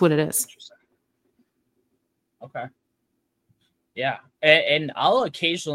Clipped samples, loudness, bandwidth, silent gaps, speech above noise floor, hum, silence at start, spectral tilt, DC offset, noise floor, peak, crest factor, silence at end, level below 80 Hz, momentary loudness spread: under 0.1%; -21 LUFS; 16.5 kHz; none; 53 dB; none; 0 s; -3.5 dB/octave; under 0.1%; -75 dBFS; 0 dBFS; 24 dB; 0 s; -70 dBFS; 20 LU